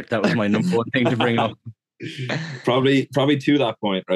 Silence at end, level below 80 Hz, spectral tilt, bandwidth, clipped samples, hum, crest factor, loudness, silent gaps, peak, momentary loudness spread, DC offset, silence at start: 0 s; -68 dBFS; -6.5 dB/octave; 12 kHz; under 0.1%; none; 18 dB; -20 LUFS; none; -2 dBFS; 9 LU; under 0.1%; 0 s